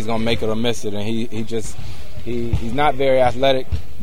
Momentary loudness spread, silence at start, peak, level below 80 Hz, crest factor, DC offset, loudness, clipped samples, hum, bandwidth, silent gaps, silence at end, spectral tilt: 14 LU; 0 s; -2 dBFS; -34 dBFS; 18 dB; 10%; -21 LUFS; under 0.1%; none; 16.5 kHz; none; 0 s; -5.5 dB/octave